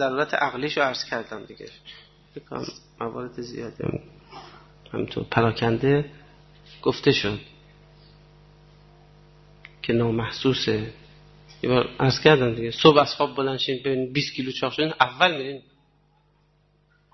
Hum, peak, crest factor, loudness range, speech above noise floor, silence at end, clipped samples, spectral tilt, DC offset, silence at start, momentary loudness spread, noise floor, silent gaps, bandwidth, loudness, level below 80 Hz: 50 Hz at -50 dBFS; -2 dBFS; 24 dB; 12 LU; 39 dB; 1.55 s; under 0.1%; -6 dB/octave; under 0.1%; 0 s; 20 LU; -63 dBFS; none; 6.2 kHz; -23 LUFS; -54 dBFS